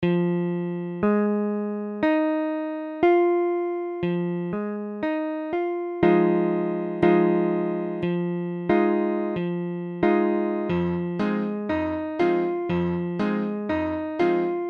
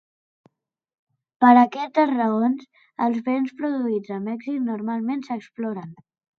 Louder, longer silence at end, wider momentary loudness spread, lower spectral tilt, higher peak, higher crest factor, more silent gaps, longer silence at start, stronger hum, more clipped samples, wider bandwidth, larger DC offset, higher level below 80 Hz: about the same, -24 LUFS vs -22 LUFS; second, 0 s vs 0.45 s; second, 8 LU vs 15 LU; first, -9.5 dB/octave vs -7.5 dB/octave; about the same, -4 dBFS vs -2 dBFS; about the same, 20 dB vs 22 dB; neither; second, 0 s vs 1.4 s; neither; neither; second, 5.2 kHz vs 6.4 kHz; neither; first, -56 dBFS vs -78 dBFS